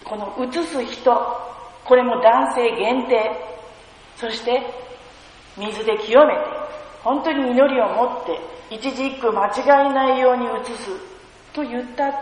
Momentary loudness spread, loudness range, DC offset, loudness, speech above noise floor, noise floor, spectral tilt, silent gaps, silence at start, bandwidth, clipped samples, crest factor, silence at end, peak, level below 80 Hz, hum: 17 LU; 3 LU; under 0.1%; -19 LUFS; 25 dB; -44 dBFS; -4 dB/octave; none; 0.05 s; 10.5 kHz; under 0.1%; 18 dB; 0 s; -2 dBFS; -56 dBFS; none